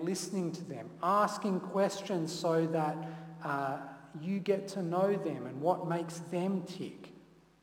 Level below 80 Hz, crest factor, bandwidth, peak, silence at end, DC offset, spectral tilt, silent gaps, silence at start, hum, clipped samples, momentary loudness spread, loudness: -78 dBFS; 20 dB; 17 kHz; -16 dBFS; 0.4 s; under 0.1%; -6 dB/octave; none; 0 s; none; under 0.1%; 13 LU; -34 LUFS